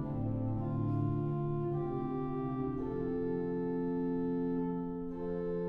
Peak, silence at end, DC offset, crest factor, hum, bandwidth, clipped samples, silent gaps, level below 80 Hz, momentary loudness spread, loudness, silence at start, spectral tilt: -22 dBFS; 0 s; under 0.1%; 12 dB; none; 4.2 kHz; under 0.1%; none; -52 dBFS; 3 LU; -36 LUFS; 0 s; -12 dB/octave